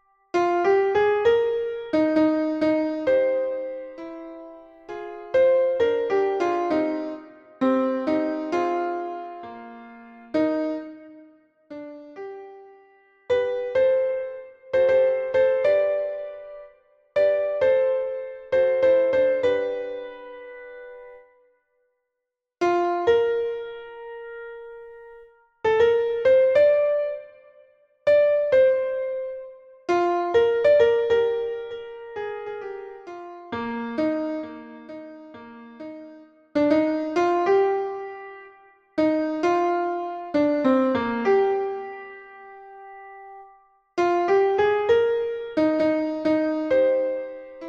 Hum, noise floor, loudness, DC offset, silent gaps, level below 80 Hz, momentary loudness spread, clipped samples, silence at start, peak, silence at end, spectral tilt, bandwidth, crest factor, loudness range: none; -84 dBFS; -22 LUFS; under 0.1%; none; -62 dBFS; 21 LU; under 0.1%; 0.35 s; -8 dBFS; 0 s; -6 dB/octave; 7.2 kHz; 16 dB; 9 LU